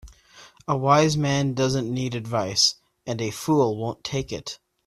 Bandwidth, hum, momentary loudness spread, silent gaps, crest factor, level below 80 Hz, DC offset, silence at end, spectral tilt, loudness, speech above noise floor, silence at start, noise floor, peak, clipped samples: 14.5 kHz; none; 14 LU; none; 20 dB; -54 dBFS; under 0.1%; 0.3 s; -4.5 dB/octave; -23 LUFS; 28 dB; 0.05 s; -51 dBFS; -4 dBFS; under 0.1%